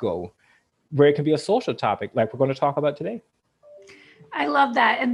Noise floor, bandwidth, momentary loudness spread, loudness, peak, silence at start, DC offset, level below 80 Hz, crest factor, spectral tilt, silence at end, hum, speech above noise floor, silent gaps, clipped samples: -50 dBFS; 11 kHz; 14 LU; -22 LUFS; -4 dBFS; 0 s; under 0.1%; -66 dBFS; 18 dB; -6.5 dB/octave; 0 s; none; 29 dB; none; under 0.1%